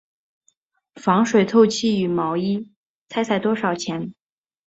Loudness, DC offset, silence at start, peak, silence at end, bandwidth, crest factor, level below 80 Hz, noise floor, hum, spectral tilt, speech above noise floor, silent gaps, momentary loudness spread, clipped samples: -20 LUFS; under 0.1%; 0.95 s; -4 dBFS; 0.55 s; 8 kHz; 18 dB; -64 dBFS; -66 dBFS; none; -5.5 dB/octave; 47 dB; 2.76-3.06 s; 12 LU; under 0.1%